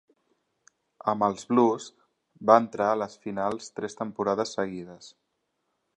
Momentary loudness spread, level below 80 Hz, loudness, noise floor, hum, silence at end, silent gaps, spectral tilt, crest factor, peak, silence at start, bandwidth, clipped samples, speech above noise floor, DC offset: 14 LU; -70 dBFS; -27 LUFS; -78 dBFS; none; 0.9 s; none; -5.5 dB/octave; 26 dB; -2 dBFS; 1.05 s; 10.5 kHz; under 0.1%; 52 dB; under 0.1%